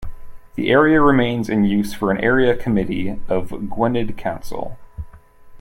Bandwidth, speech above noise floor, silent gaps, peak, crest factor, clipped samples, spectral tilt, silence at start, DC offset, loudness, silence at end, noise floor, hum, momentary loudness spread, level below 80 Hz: 16.5 kHz; 24 dB; none; -2 dBFS; 16 dB; under 0.1%; -7 dB/octave; 0 s; under 0.1%; -18 LUFS; 0 s; -41 dBFS; none; 20 LU; -36 dBFS